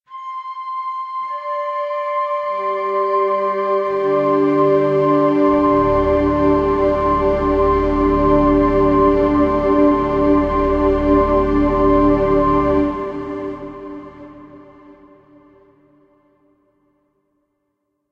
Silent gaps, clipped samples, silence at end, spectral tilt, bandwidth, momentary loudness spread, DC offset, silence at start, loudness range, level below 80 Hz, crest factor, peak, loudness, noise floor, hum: none; under 0.1%; 3.2 s; -9 dB/octave; 5.8 kHz; 12 LU; under 0.1%; 0.1 s; 7 LU; -32 dBFS; 14 dB; -2 dBFS; -16 LUFS; -72 dBFS; none